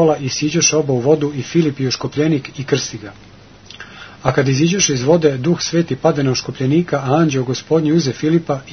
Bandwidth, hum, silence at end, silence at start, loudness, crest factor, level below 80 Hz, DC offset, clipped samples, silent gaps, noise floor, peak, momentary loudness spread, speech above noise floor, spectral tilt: 6.6 kHz; none; 0 s; 0 s; -16 LUFS; 16 dB; -50 dBFS; 0.2%; under 0.1%; none; -40 dBFS; 0 dBFS; 7 LU; 24 dB; -5 dB/octave